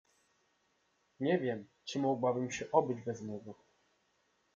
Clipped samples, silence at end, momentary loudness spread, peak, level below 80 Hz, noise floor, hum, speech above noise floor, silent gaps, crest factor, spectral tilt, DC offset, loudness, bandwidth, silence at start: under 0.1%; 1 s; 12 LU; -14 dBFS; -78 dBFS; -76 dBFS; none; 42 dB; none; 24 dB; -6 dB/octave; under 0.1%; -35 LUFS; 7.8 kHz; 1.2 s